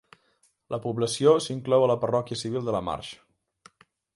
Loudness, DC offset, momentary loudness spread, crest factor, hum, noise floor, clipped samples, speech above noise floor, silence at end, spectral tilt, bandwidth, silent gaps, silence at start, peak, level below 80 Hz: -26 LUFS; under 0.1%; 13 LU; 20 dB; none; -68 dBFS; under 0.1%; 43 dB; 1 s; -5.5 dB/octave; 11.5 kHz; none; 0.7 s; -8 dBFS; -60 dBFS